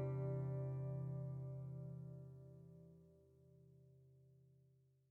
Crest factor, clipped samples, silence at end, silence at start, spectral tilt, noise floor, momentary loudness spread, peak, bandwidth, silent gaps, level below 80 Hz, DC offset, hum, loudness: 16 dB; under 0.1%; 0.55 s; 0 s; -11.5 dB/octave; -74 dBFS; 25 LU; -34 dBFS; 2.5 kHz; none; -76 dBFS; under 0.1%; none; -48 LUFS